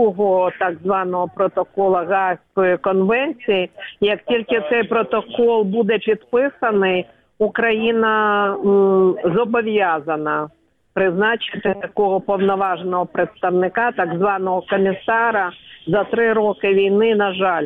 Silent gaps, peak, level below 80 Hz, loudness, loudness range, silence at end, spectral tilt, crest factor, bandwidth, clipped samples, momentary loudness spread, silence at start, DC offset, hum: none; -6 dBFS; -58 dBFS; -18 LUFS; 2 LU; 0 s; -8.5 dB/octave; 12 dB; 3.9 kHz; under 0.1%; 6 LU; 0 s; under 0.1%; none